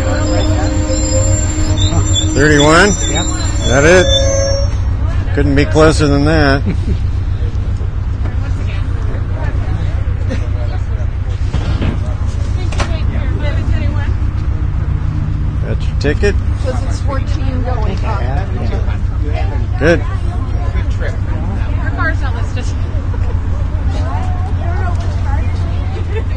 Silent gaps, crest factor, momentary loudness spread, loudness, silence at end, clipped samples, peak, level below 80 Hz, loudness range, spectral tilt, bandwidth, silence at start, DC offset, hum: none; 14 dB; 8 LU; -15 LUFS; 0 s; under 0.1%; 0 dBFS; -18 dBFS; 7 LU; -5.5 dB/octave; 10 kHz; 0 s; under 0.1%; none